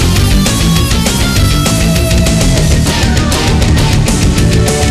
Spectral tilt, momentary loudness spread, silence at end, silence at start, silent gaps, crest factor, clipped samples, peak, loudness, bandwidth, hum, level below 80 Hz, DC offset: -4.5 dB/octave; 1 LU; 0 s; 0 s; none; 8 dB; under 0.1%; -2 dBFS; -10 LUFS; 15.5 kHz; none; -14 dBFS; under 0.1%